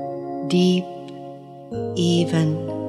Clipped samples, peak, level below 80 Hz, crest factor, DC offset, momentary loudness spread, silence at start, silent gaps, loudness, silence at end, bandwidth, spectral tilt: under 0.1%; -8 dBFS; -62 dBFS; 16 dB; under 0.1%; 18 LU; 0 s; none; -21 LUFS; 0 s; 11.5 kHz; -6.5 dB/octave